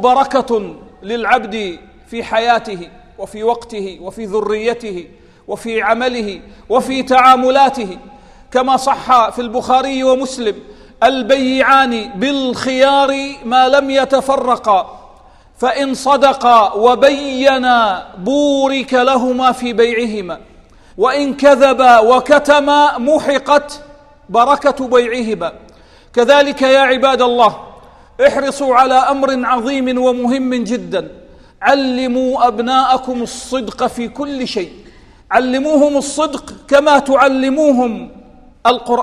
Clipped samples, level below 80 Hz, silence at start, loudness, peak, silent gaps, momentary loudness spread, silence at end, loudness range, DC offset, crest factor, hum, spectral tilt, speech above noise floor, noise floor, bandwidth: 0.1%; -46 dBFS; 0 s; -13 LUFS; 0 dBFS; none; 14 LU; 0 s; 7 LU; under 0.1%; 14 dB; none; -3.5 dB/octave; 30 dB; -43 dBFS; 13 kHz